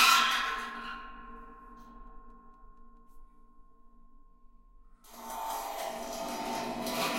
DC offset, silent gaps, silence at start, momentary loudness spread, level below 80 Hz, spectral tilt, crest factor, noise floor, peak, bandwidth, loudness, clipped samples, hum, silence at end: under 0.1%; none; 0 s; 25 LU; -56 dBFS; -1 dB/octave; 24 dB; -56 dBFS; -10 dBFS; 16.5 kHz; -32 LUFS; under 0.1%; none; 0 s